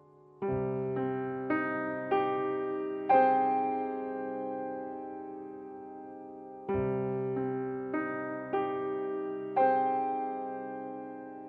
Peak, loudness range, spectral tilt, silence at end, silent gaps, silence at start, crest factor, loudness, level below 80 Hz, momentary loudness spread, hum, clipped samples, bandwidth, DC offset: -14 dBFS; 7 LU; -10 dB/octave; 0 s; none; 0.35 s; 18 dB; -32 LUFS; -64 dBFS; 16 LU; none; under 0.1%; 4.6 kHz; under 0.1%